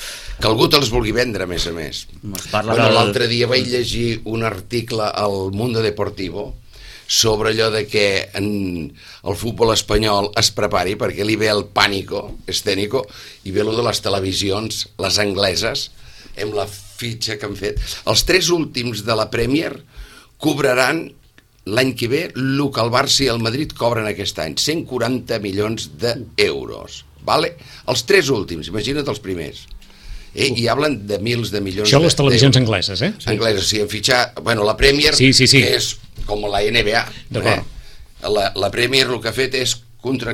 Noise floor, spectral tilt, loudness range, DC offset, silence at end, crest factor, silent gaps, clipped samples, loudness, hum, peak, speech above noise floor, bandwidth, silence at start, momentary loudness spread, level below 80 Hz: -39 dBFS; -4 dB/octave; 6 LU; under 0.1%; 0 s; 18 dB; none; under 0.1%; -17 LUFS; none; 0 dBFS; 21 dB; 17 kHz; 0 s; 14 LU; -36 dBFS